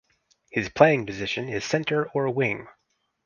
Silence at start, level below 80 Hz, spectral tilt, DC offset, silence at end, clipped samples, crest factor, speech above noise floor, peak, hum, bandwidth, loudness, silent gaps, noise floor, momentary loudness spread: 0.55 s; -58 dBFS; -5.5 dB/octave; under 0.1%; 0.55 s; under 0.1%; 26 dB; 40 dB; 0 dBFS; none; 7.2 kHz; -24 LUFS; none; -64 dBFS; 10 LU